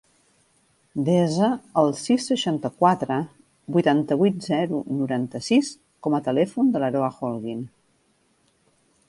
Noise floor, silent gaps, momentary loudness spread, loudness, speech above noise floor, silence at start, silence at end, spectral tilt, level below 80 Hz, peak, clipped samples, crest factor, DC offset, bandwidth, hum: -65 dBFS; none; 10 LU; -23 LUFS; 43 dB; 0.95 s; 1.4 s; -6 dB/octave; -66 dBFS; -4 dBFS; under 0.1%; 20 dB; under 0.1%; 11.5 kHz; none